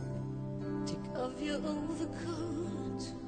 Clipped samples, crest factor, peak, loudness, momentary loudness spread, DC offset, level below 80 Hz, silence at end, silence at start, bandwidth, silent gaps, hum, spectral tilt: under 0.1%; 14 dB; -24 dBFS; -38 LUFS; 4 LU; under 0.1%; -56 dBFS; 0 s; 0 s; 9.4 kHz; none; none; -6.5 dB/octave